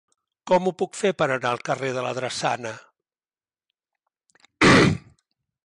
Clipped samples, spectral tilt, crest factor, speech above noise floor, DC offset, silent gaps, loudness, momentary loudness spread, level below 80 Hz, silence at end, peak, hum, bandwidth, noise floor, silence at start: under 0.1%; -5 dB/octave; 18 dB; over 66 dB; under 0.1%; none; -22 LUFS; 14 LU; -50 dBFS; 0.7 s; -6 dBFS; none; 11.5 kHz; under -90 dBFS; 0.45 s